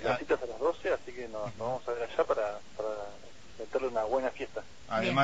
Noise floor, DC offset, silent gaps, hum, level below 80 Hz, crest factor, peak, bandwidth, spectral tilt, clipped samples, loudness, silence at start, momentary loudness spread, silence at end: -52 dBFS; 0.5%; none; none; -60 dBFS; 20 dB; -14 dBFS; 8 kHz; -5.5 dB/octave; under 0.1%; -34 LUFS; 0 s; 11 LU; 0 s